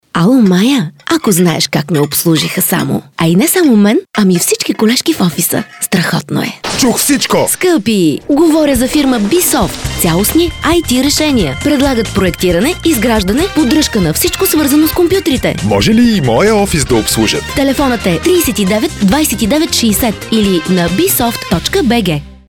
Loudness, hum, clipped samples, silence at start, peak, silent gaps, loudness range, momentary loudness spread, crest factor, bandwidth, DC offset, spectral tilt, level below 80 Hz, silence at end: -11 LUFS; none; under 0.1%; 0.15 s; 0 dBFS; none; 1 LU; 5 LU; 10 dB; 18.5 kHz; under 0.1%; -4.5 dB/octave; -30 dBFS; 0.15 s